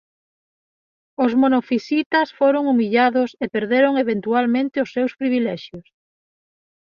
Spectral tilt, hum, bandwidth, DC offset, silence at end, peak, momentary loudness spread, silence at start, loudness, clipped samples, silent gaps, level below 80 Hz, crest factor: -6.5 dB/octave; none; 6.8 kHz; under 0.1%; 1.1 s; -4 dBFS; 7 LU; 1.2 s; -19 LUFS; under 0.1%; 2.06-2.10 s; -66 dBFS; 16 dB